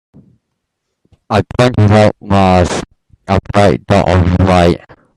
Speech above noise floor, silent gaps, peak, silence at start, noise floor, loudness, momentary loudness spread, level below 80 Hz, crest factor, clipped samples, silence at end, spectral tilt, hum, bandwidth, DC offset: 62 dB; none; 0 dBFS; 1.3 s; -72 dBFS; -11 LUFS; 8 LU; -34 dBFS; 12 dB; under 0.1%; 0.4 s; -7 dB/octave; none; 11.5 kHz; under 0.1%